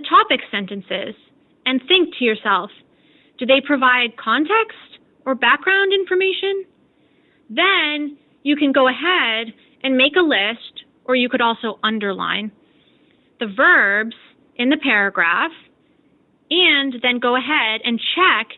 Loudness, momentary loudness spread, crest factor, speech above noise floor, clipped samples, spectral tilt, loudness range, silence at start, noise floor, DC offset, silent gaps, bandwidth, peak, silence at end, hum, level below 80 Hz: -17 LUFS; 13 LU; 16 dB; 40 dB; under 0.1%; -7.5 dB/octave; 2 LU; 0 s; -58 dBFS; under 0.1%; none; 4.3 kHz; -2 dBFS; 0 s; none; -66 dBFS